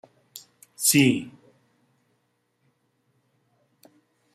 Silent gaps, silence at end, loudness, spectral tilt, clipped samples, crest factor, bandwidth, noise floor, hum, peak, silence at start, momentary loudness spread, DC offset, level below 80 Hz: none; 3.05 s; -21 LUFS; -3.5 dB/octave; under 0.1%; 24 dB; 15.5 kHz; -72 dBFS; none; -6 dBFS; 0.35 s; 27 LU; under 0.1%; -68 dBFS